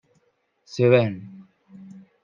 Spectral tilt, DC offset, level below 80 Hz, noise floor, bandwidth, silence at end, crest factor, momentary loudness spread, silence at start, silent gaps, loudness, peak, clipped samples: -7.5 dB/octave; under 0.1%; -72 dBFS; -68 dBFS; 7.4 kHz; 0.9 s; 22 dB; 26 LU; 0.75 s; none; -20 LUFS; -4 dBFS; under 0.1%